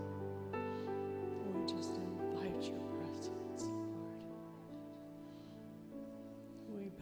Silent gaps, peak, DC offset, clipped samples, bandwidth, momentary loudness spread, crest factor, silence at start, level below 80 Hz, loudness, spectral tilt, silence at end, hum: none; -28 dBFS; under 0.1%; under 0.1%; over 20 kHz; 12 LU; 16 dB; 0 s; -74 dBFS; -45 LUFS; -6 dB/octave; 0 s; none